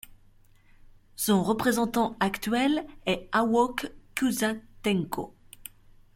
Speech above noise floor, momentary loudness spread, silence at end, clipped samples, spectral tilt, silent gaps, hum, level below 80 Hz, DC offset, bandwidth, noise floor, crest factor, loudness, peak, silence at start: 31 dB; 19 LU; 0.55 s; under 0.1%; -4.5 dB/octave; none; none; -56 dBFS; under 0.1%; 16.5 kHz; -57 dBFS; 18 dB; -27 LUFS; -10 dBFS; 0.1 s